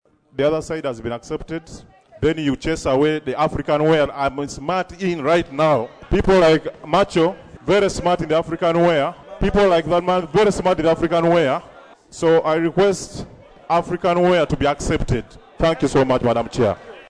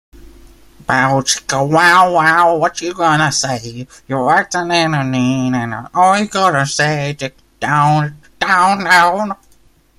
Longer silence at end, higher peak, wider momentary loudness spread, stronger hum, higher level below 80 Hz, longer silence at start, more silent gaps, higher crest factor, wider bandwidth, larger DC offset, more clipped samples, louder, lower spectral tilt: second, 0.1 s vs 0.65 s; second, -6 dBFS vs 0 dBFS; second, 10 LU vs 13 LU; neither; first, -36 dBFS vs -48 dBFS; first, 0.35 s vs 0.15 s; neither; about the same, 14 dB vs 14 dB; second, 11 kHz vs 16 kHz; neither; neither; second, -19 LUFS vs -13 LUFS; first, -6 dB/octave vs -4 dB/octave